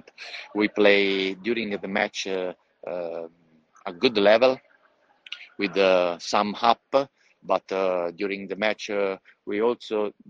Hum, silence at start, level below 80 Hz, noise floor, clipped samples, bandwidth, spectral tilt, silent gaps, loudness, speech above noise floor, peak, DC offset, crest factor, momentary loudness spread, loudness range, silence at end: none; 0.2 s; -68 dBFS; -63 dBFS; under 0.1%; 7.8 kHz; -4.5 dB/octave; none; -24 LUFS; 39 dB; -2 dBFS; under 0.1%; 22 dB; 19 LU; 4 LU; 0.2 s